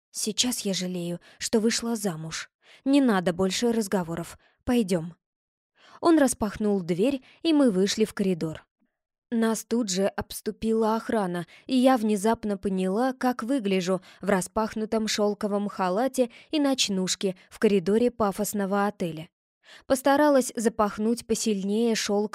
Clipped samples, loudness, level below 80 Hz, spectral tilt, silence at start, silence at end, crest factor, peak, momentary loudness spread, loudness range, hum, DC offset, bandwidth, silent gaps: under 0.1%; -26 LUFS; -56 dBFS; -4.5 dB/octave; 0.15 s; 0.05 s; 18 dB; -8 dBFS; 11 LU; 2 LU; none; under 0.1%; 16 kHz; 2.54-2.59 s, 5.26-5.70 s, 8.71-8.76 s, 9.18-9.22 s, 19.32-19.61 s